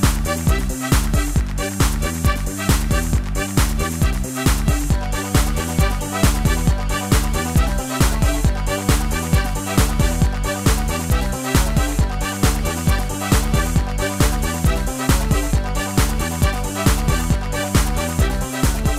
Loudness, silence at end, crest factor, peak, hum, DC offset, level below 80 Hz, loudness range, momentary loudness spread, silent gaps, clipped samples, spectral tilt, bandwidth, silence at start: -20 LUFS; 0 s; 16 dB; -2 dBFS; none; under 0.1%; -22 dBFS; 1 LU; 3 LU; none; under 0.1%; -4.5 dB/octave; 16 kHz; 0 s